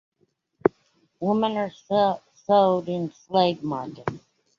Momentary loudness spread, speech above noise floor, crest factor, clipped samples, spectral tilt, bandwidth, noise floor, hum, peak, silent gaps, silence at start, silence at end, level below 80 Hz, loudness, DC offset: 13 LU; 46 dB; 22 dB; under 0.1%; -7 dB/octave; 7.2 kHz; -70 dBFS; none; -2 dBFS; none; 0.65 s; 0.4 s; -64 dBFS; -25 LUFS; under 0.1%